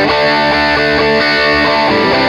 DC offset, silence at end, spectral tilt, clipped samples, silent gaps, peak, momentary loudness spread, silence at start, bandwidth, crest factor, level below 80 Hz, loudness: under 0.1%; 0 s; -5 dB/octave; under 0.1%; none; -2 dBFS; 1 LU; 0 s; 12 kHz; 10 dB; -34 dBFS; -10 LUFS